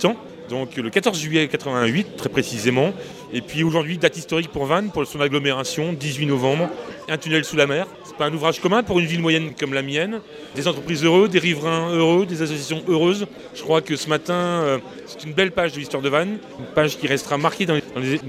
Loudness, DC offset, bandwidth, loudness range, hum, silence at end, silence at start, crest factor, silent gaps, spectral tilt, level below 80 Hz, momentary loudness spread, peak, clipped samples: -21 LUFS; under 0.1%; 15.5 kHz; 2 LU; none; 0 s; 0 s; 20 dB; none; -5 dB/octave; -56 dBFS; 9 LU; -2 dBFS; under 0.1%